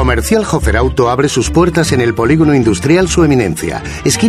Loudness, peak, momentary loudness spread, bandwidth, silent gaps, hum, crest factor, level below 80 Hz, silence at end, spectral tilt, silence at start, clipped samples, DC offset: -12 LUFS; 0 dBFS; 5 LU; 14.5 kHz; none; none; 10 dB; -22 dBFS; 0 s; -5.5 dB/octave; 0 s; under 0.1%; under 0.1%